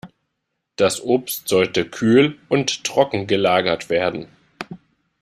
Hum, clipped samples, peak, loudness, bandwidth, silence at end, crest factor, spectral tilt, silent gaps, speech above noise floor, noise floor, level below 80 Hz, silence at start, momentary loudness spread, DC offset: none; under 0.1%; -2 dBFS; -19 LUFS; 15.5 kHz; 0.45 s; 18 dB; -4.5 dB/octave; none; 58 dB; -76 dBFS; -58 dBFS; 0.05 s; 19 LU; under 0.1%